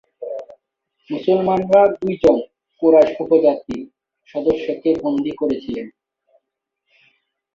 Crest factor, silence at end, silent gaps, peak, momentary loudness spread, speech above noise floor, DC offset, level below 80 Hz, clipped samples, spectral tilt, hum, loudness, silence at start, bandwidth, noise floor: 18 dB; 1.65 s; none; -2 dBFS; 17 LU; 62 dB; under 0.1%; -52 dBFS; under 0.1%; -8 dB/octave; none; -17 LUFS; 0.2 s; 7.4 kHz; -78 dBFS